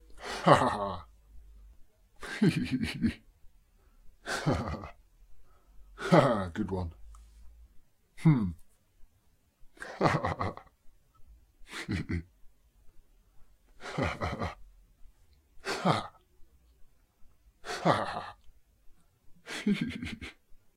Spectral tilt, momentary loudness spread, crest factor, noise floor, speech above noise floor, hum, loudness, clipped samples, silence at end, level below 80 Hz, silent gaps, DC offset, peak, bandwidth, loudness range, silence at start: -6.5 dB/octave; 22 LU; 28 dB; -68 dBFS; 39 dB; none; -31 LUFS; under 0.1%; 0.2 s; -54 dBFS; none; under 0.1%; -6 dBFS; 14 kHz; 9 LU; 0.1 s